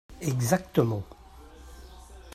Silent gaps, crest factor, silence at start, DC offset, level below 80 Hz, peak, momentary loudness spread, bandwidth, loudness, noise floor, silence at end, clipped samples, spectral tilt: none; 22 dB; 0.1 s; under 0.1%; -50 dBFS; -8 dBFS; 24 LU; 15.5 kHz; -28 LUFS; -49 dBFS; 0 s; under 0.1%; -6 dB/octave